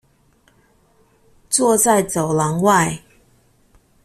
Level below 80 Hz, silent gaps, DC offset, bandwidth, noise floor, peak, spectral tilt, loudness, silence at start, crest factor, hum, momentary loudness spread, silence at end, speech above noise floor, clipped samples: -54 dBFS; none; under 0.1%; 15.5 kHz; -57 dBFS; -2 dBFS; -4 dB/octave; -16 LUFS; 1.5 s; 18 dB; none; 7 LU; 1.05 s; 41 dB; under 0.1%